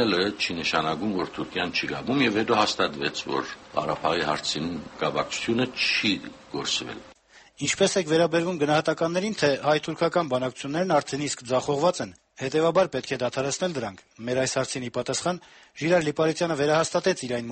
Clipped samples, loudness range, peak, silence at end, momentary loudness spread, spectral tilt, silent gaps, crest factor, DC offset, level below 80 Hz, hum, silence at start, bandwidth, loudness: under 0.1%; 3 LU; -8 dBFS; 0 s; 8 LU; -4 dB/octave; none; 18 dB; under 0.1%; -60 dBFS; none; 0 s; 8.8 kHz; -25 LUFS